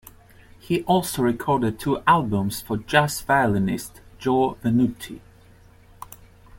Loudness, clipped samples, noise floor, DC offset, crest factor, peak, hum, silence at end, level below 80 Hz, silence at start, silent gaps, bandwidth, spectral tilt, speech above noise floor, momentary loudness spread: -22 LUFS; under 0.1%; -51 dBFS; under 0.1%; 20 dB; -2 dBFS; none; 0 s; -50 dBFS; 0.65 s; none; 17 kHz; -5.5 dB/octave; 29 dB; 19 LU